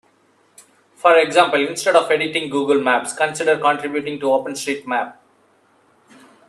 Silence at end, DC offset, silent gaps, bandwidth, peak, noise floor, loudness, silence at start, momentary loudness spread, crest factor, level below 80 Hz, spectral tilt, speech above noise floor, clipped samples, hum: 1.35 s; under 0.1%; none; 13 kHz; 0 dBFS; -58 dBFS; -18 LUFS; 1.05 s; 10 LU; 20 dB; -68 dBFS; -3 dB/octave; 40 dB; under 0.1%; none